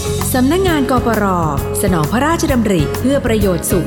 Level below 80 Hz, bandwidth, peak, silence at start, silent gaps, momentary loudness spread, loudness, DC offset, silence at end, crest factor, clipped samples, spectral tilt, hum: -28 dBFS; 17.5 kHz; -2 dBFS; 0 s; none; 3 LU; -14 LUFS; under 0.1%; 0 s; 12 dB; under 0.1%; -5.5 dB/octave; none